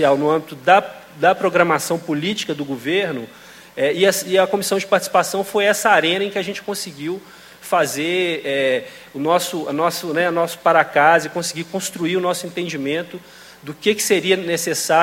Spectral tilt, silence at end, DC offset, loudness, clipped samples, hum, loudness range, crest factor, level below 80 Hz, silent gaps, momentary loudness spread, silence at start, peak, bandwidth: -3.5 dB/octave; 0 s; under 0.1%; -19 LUFS; under 0.1%; none; 4 LU; 18 dB; -64 dBFS; none; 11 LU; 0 s; 0 dBFS; 16.5 kHz